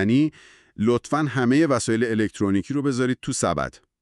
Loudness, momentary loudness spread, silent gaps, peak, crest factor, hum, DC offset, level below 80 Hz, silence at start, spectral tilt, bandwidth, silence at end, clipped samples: -23 LUFS; 6 LU; none; -8 dBFS; 14 dB; none; under 0.1%; -52 dBFS; 0 s; -5.5 dB/octave; 12 kHz; 0.3 s; under 0.1%